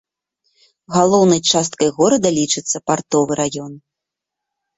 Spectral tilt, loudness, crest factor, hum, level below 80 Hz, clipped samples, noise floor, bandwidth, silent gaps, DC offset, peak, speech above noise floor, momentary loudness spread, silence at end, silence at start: -4 dB/octave; -16 LUFS; 16 dB; none; -56 dBFS; under 0.1%; -83 dBFS; 8.4 kHz; none; under 0.1%; -2 dBFS; 67 dB; 8 LU; 1 s; 0.9 s